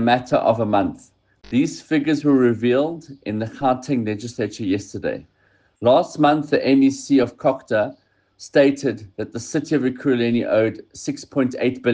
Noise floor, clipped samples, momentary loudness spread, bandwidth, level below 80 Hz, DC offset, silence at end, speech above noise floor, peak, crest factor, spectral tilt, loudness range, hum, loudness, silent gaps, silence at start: -58 dBFS; under 0.1%; 11 LU; 9.4 kHz; -58 dBFS; under 0.1%; 0 s; 38 dB; -4 dBFS; 16 dB; -6 dB/octave; 3 LU; none; -20 LUFS; none; 0 s